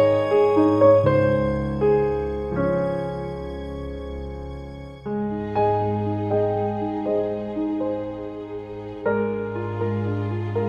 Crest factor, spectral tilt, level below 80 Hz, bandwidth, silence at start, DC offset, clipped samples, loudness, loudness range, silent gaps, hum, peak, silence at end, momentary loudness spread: 18 dB; -9.5 dB/octave; -42 dBFS; 7 kHz; 0 s; under 0.1%; under 0.1%; -23 LUFS; 7 LU; none; none; -6 dBFS; 0 s; 16 LU